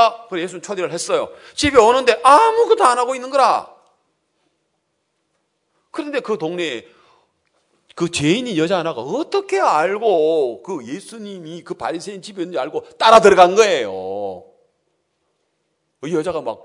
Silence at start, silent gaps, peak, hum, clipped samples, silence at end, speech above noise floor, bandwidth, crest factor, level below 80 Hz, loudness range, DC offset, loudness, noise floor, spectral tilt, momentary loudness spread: 0 s; none; 0 dBFS; none; 0.1%; 0.1 s; 54 dB; 12 kHz; 18 dB; -56 dBFS; 13 LU; under 0.1%; -16 LUFS; -71 dBFS; -4 dB/octave; 19 LU